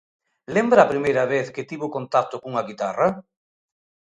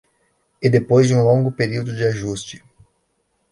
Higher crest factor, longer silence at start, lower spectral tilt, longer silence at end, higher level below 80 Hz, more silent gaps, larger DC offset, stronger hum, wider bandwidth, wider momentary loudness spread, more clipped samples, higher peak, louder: first, 22 dB vs 16 dB; about the same, 0.5 s vs 0.6 s; about the same, -6 dB/octave vs -6.5 dB/octave; about the same, 0.95 s vs 0.95 s; second, -64 dBFS vs -54 dBFS; neither; neither; neither; second, 9.4 kHz vs 11.5 kHz; about the same, 13 LU vs 12 LU; neither; about the same, -2 dBFS vs -4 dBFS; second, -22 LUFS vs -18 LUFS